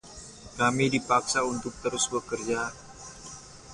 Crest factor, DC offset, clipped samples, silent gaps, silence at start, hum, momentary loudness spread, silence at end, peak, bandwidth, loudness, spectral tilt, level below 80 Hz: 20 dB; under 0.1%; under 0.1%; none; 0.05 s; none; 20 LU; 0 s; -10 dBFS; 11.5 kHz; -27 LUFS; -3.5 dB/octave; -56 dBFS